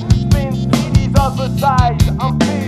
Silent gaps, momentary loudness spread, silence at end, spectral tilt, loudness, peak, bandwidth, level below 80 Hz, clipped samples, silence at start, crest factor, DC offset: none; 3 LU; 0 s; -6.5 dB/octave; -14 LUFS; 0 dBFS; 14 kHz; -22 dBFS; under 0.1%; 0 s; 14 dB; under 0.1%